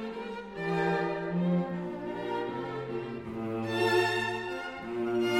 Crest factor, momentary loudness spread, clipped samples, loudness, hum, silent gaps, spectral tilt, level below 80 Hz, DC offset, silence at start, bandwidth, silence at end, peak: 18 dB; 10 LU; under 0.1%; -32 LUFS; none; none; -6 dB/octave; -62 dBFS; under 0.1%; 0 s; 16.5 kHz; 0 s; -14 dBFS